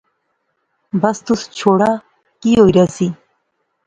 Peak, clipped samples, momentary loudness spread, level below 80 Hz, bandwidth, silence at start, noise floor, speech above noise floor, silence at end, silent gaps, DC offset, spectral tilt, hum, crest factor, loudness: 0 dBFS; under 0.1%; 12 LU; -46 dBFS; 9.4 kHz; 0.95 s; -68 dBFS; 55 dB; 0.75 s; none; under 0.1%; -6.5 dB/octave; none; 16 dB; -15 LUFS